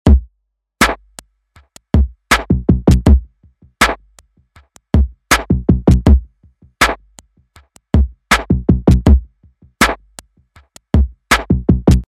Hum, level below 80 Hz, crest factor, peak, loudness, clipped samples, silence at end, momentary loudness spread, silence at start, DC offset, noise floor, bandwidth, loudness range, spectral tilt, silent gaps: none; -18 dBFS; 14 dB; 0 dBFS; -14 LUFS; under 0.1%; 0.05 s; 5 LU; 0.05 s; under 0.1%; -69 dBFS; 16 kHz; 0 LU; -5.5 dB/octave; none